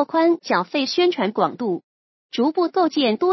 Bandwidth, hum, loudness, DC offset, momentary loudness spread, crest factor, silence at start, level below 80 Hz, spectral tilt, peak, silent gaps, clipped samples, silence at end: 6.2 kHz; none; -21 LUFS; under 0.1%; 8 LU; 16 dB; 0 s; -80 dBFS; -5 dB/octave; -4 dBFS; 1.84-2.29 s; under 0.1%; 0 s